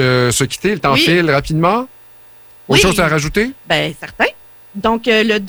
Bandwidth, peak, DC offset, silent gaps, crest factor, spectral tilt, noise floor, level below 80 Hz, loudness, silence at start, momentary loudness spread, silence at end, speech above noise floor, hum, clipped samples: over 20 kHz; -2 dBFS; under 0.1%; none; 14 dB; -4 dB/octave; -40 dBFS; -36 dBFS; -14 LUFS; 0 s; 8 LU; 0 s; 26 dB; 60 Hz at -45 dBFS; under 0.1%